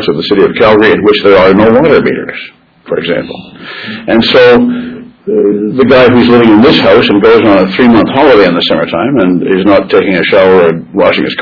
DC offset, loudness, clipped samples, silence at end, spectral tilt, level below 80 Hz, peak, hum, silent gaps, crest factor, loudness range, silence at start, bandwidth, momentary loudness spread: under 0.1%; -6 LUFS; 4%; 0 s; -7.5 dB/octave; -38 dBFS; 0 dBFS; none; none; 6 dB; 5 LU; 0 s; 5.4 kHz; 13 LU